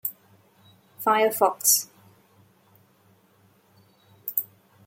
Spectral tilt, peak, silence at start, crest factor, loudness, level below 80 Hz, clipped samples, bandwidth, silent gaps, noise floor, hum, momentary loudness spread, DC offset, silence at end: -0.5 dB/octave; -4 dBFS; 0.05 s; 24 dB; -23 LUFS; -82 dBFS; under 0.1%; 17 kHz; none; -61 dBFS; none; 18 LU; under 0.1%; 0.4 s